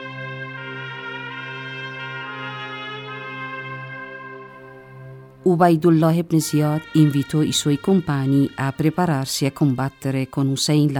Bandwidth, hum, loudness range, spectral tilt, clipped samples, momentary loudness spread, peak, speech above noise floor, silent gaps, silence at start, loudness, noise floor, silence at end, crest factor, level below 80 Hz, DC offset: 17.5 kHz; none; 13 LU; -5.5 dB/octave; under 0.1%; 17 LU; -2 dBFS; 23 dB; none; 0 s; -21 LUFS; -41 dBFS; 0 s; 20 dB; -58 dBFS; under 0.1%